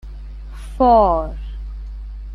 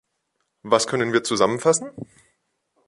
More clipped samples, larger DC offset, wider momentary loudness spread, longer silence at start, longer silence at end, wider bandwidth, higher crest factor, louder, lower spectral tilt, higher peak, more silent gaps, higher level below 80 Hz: neither; neither; first, 23 LU vs 19 LU; second, 0.05 s vs 0.65 s; second, 0 s vs 0.85 s; about the same, 10.5 kHz vs 11.5 kHz; about the same, 16 dB vs 20 dB; first, -15 LUFS vs -21 LUFS; first, -8.5 dB/octave vs -3.5 dB/octave; about the same, -2 dBFS vs -2 dBFS; neither; first, -28 dBFS vs -64 dBFS